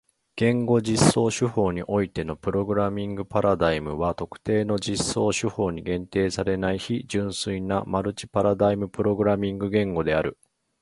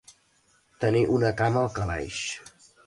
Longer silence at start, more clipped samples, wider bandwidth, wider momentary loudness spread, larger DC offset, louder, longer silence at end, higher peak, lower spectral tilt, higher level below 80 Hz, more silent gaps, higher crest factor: second, 0.35 s vs 0.8 s; neither; about the same, 11.5 kHz vs 11.5 kHz; second, 7 LU vs 10 LU; neither; about the same, -25 LUFS vs -26 LUFS; about the same, 0.5 s vs 0.45 s; first, -4 dBFS vs -12 dBFS; about the same, -5.5 dB/octave vs -5.5 dB/octave; about the same, -46 dBFS vs -48 dBFS; neither; about the same, 20 dB vs 16 dB